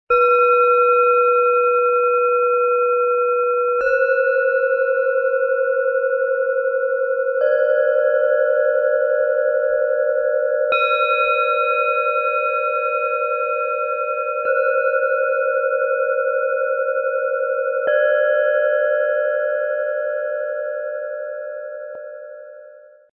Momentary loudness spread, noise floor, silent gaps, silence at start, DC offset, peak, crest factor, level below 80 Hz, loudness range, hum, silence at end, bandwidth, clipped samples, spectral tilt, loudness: 8 LU; -44 dBFS; none; 0.1 s; under 0.1%; -6 dBFS; 12 dB; -64 dBFS; 3 LU; none; 0.35 s; 4.3 kHz; under 0.1%; -2.5 dB/octave; -18 LUFS